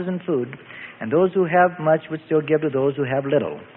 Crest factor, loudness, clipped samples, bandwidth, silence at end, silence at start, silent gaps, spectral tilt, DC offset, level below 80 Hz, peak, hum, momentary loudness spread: 18 dB; -21 LUFS; under 0.1%; 4 kHz; 0.1 s; 0 s; none; -12 dB/octave; under 0.1%; -64 dBFS; -4 dBFS; none; 12 LU